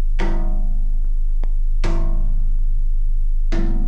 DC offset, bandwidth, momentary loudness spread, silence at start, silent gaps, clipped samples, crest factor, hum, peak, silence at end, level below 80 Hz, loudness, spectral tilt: under 0.1%; 3.6 kHz; 2 LU; 0 s; none; under 0.1%; 8 dB; none; -8 dBFS; 0 s; -16 dBFS; -25 LUFS; -7.5 dB/octave